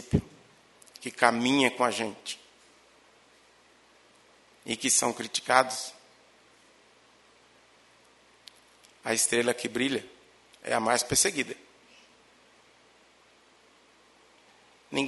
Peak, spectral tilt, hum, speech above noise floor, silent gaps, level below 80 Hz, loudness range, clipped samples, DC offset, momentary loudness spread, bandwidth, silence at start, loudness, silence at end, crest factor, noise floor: -2 dBFS; -2.5 dB/octave; none; 33 dB; none; -60 dBFS; 7 LU; under 0.1%; under 0.1%; 17 LU; 11.5 kHz; 0 s; -27 LUFS; 0 s; 30 dB; -60 dBFS